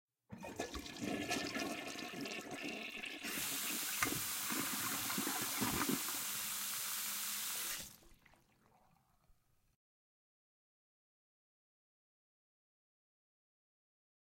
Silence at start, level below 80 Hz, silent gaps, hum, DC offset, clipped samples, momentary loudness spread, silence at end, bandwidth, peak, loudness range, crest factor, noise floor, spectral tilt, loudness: 0.3 s; -70 dBFS; none; none; under 0.1%; under 0.1%; 9 LU; 5 s; 16.5 kHz; -18 dBFS; 7 LU; 26 dB; -73 dBFS; -1.5 dB/octave; -39 LUFS